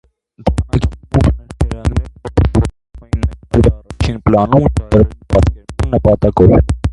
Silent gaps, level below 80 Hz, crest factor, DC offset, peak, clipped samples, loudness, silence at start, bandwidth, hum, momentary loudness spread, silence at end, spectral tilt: none; -20 dBFS; 14 dB; under 0.1%; 0 dBFS; under 0.1%; -14 LUFS; 0.4 s; 11.5 kHz; none; 10 LU; 0 s; -8.5 dB/octave